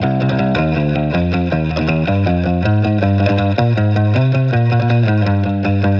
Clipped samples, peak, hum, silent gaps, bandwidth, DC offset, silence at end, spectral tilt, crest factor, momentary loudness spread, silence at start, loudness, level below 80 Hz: under 0.1%; -2 dBFS; none; none; 6.4 kHz; under 0.1%; 0 s; -9 dB/octave; 12 dB; 3 LU; 0 s; -15 LUFS; -34 dBFS